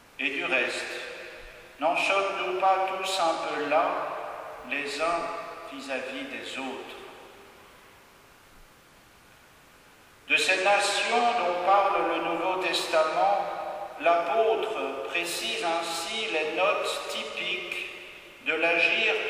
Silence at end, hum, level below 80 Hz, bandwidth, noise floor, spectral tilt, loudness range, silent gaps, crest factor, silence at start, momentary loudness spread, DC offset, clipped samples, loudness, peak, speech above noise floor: 0 s; none; -66 dBFS; 15.5 kHz; -55 dBFS; -1.5 dB/octave; 12 LU; none; 18 dB; 0.2 s; 15 LU; under 0.1%; under 0.1%; -26 LUFS; -10 dBFS; 29 dB